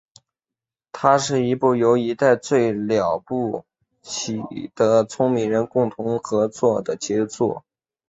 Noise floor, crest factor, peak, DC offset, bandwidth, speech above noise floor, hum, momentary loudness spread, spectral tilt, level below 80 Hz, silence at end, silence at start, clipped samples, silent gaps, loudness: -89 dBFS; 20 dB; -2 dBFS; under 0.1%; 8 kHz; 69 dB; none; 10 LU; -5.5 dB/octave; -60 dBFS; 0.5 s; 0.95 s; under 0.1%; none; -21 LUFS